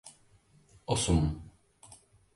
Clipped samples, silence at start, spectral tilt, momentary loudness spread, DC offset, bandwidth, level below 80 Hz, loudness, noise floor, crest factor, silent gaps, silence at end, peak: under 0.1%; 0.05 s; -5 dB/octave; 26 LU; under 0.1%; 11.5 kHz; -42 dBFS; -30 LUFS; -63 dBFS; 20 dB; none; 0.4 s; -14 dBFS